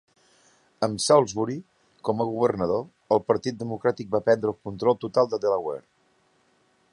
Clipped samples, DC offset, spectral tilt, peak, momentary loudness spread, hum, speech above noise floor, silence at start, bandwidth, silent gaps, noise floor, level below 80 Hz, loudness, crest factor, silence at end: under 0.1%; under 0.1%; -5 dB/octave; -4 dBFS; 11 LU; none; 41 dB; 0.8 s; 11.5 kHz; none; -65 dBFS; -62 dBFS; -25 LUFS; 20 dB; 1.1 s